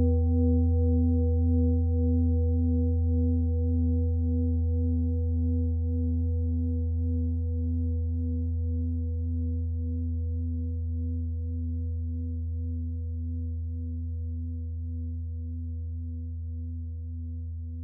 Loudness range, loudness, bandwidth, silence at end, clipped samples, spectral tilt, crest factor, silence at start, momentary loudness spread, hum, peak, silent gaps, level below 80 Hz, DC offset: 9 LU; -29 LUFS; 0.8 kHz; 0 s; under 0.1%; -17 dB/octave; 12 dB; 0 s; 11 LU; none; -14 dBFS; none; -36 dBFS; under 0.1%